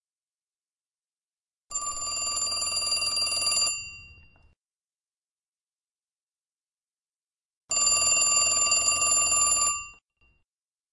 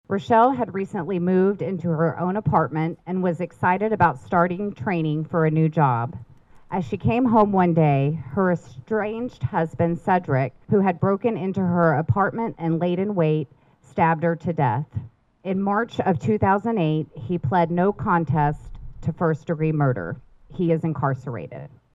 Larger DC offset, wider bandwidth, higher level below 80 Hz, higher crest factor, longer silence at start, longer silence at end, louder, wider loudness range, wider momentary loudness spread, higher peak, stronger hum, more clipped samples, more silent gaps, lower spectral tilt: neither; first, 11.5 kHz vs 7.6 kHz; second, -60 dBFS vs -50 dBFS; about the same, 18 dB vs 16 dB; first, 1.7 s vs 0.1 s; first, 1 s vs 0.3 s; about the same, -22 LUFS vs -22 LUFS; first, 9 LU vs 2 LU; about the same, 12 LU vs 10 LU; second, -12 dBFS vs -6 dBFS; neither; neither; first, 5.17-5.22 s, 5.31-5.37 s, 5.48-5.53 s, 5.92-5.96 s, 6.23-6.27 s, 7.45-7.51 s, 7.57-7.61 s vs none; second, 2 dB/octave vs -9.5 dB/octave